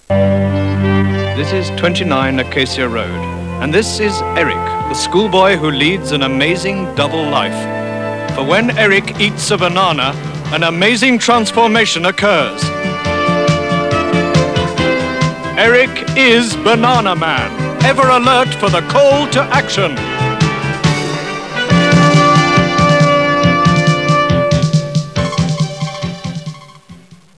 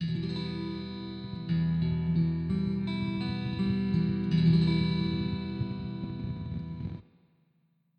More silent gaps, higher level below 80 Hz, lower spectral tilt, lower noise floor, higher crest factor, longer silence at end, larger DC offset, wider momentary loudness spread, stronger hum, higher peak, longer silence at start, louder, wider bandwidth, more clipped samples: neither; first, -38 dBFS vs -48 dBFS; second, -5 dB/octave vs -9 dB/octave; second, -39 dBFS vs -71 dBFS; about the same, 12 dB vs 16 dB; second, 0.25 s vs 0.95 s; first, 0.3% vs under 0.1%; second, 9 LU vs 13 LU; neither; first, 0 dBFS vs -14 dBFS; about the same, 0.1 s vs 0 s; first, -13 LUFS vs -31 LUFS; first, 11 kHz vs 5.2 kHz; neither